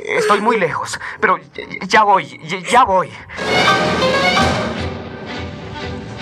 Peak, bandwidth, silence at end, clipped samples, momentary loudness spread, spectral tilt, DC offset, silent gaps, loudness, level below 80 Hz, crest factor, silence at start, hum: 0 dBFS; 14.5 kHz; 0 s; under 0.1%; 15 LU; -4 dB/octave; under 0.1%; none; -15 LUFS; -46 dBFS; 16 dB; 0 s; none